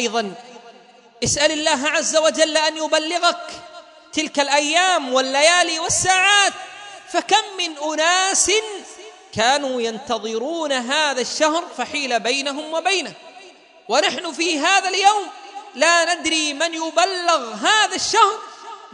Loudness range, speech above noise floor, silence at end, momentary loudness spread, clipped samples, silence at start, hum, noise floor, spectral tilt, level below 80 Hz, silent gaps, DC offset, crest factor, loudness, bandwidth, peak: 4 LU; 29 dB; 0.05 s; 15 LU; under 0.1%; 0 s; none; -48 dBFS; -1 dB/octave; -58 dBFS; none; under 0.1%; 20 dB; -18 LUFS; 11 kHz; 0 dBFS